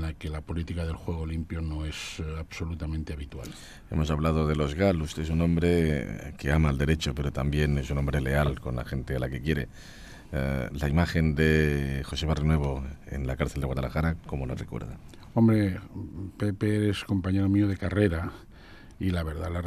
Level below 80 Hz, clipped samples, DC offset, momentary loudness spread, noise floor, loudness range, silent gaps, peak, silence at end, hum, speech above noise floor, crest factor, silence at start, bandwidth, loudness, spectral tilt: -38 dBFS; under 0.1%; under 0.1%; 13 LU; -48 dBFS; 5 LU; none; -8 dBFS; 0 s; none; 21 dB; 18 dB; 0 s; 14 kHz; -28 LUFS; -7 dB/octave